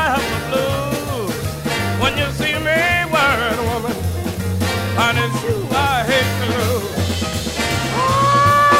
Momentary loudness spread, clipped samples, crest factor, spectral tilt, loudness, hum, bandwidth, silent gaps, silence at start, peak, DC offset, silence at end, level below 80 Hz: 7 LU; under 0.1%; 14 dB; -4.5 dB/octave; -18 LUFS; none; 16 kHz; none; 0 s; -2 dBFS; under 0.1%; 0 s; -36 dBFS